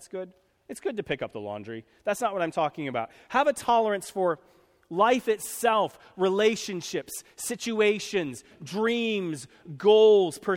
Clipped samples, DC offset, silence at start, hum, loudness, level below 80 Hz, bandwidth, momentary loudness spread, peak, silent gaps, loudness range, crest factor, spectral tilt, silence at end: under 0.1%; under 0.1%; 0 s; none; -26 LUFS; -68 dBFS; 16.5 kHz; 14 LU; -8 dBFS; none; 4 LU; 18 dB; -4 dB/octave; 0 s